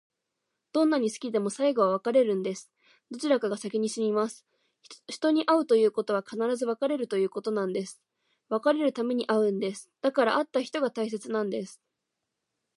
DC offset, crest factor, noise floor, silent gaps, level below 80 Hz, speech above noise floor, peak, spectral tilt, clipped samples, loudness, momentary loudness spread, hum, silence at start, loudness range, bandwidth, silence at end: under 0.1%; 18 dB; -84 dBFS; none; -84 dBFS; 57 dB; -10 dBFS; -5 dB/octave; under 0.1%; -28 LUFS; 10 LU; none; 0.75 s; 2 LU; 11.5 kHz; 1 s